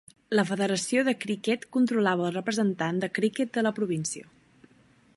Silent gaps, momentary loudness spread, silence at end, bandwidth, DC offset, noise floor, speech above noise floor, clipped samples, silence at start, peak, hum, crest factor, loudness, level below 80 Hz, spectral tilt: none; 4 LU; 0.95 s; 11.5 kHz; under 0.1%; -60 dBFS; 34 dB; under 0.1%; 0.3 s; -10 dBFS; none; 18 dB; -27 LUFS; -74 dBFS; -5 dB/octave